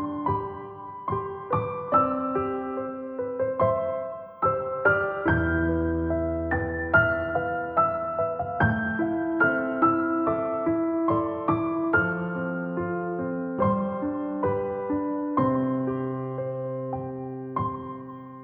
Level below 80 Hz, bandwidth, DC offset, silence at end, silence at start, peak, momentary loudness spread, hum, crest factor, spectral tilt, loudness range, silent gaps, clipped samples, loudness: -50 dBFS; 4.1 kHz; under 0.1%; 0 s; 0 s; -8 dBFS; 9 LU; none; 18 dB; -11.5 dB/octave; 4 LU; none; under 0.1%; -26 LUFS